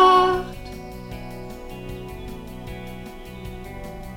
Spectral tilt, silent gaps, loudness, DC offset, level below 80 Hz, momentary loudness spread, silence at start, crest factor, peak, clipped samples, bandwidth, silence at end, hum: -5.5 dB/octave; none; -27 LUFS; under 0.1%; -40 dBFS; 16 LU; 0 s; 22 dB; -4 dBFS; under 0.1%; 17 kHz; 0 s; none